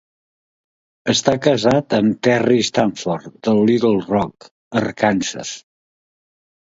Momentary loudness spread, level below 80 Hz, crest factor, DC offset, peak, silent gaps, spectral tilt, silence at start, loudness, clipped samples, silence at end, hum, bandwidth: 10 LU; -54 dBFS; 18 dB; under 0.1%; 0 dBFS; 4.51-4.71 s; -5 dB/octave; 1.05 s; -18 LUFS; under 0.1%; 1.15 s; none; 7.8 kHz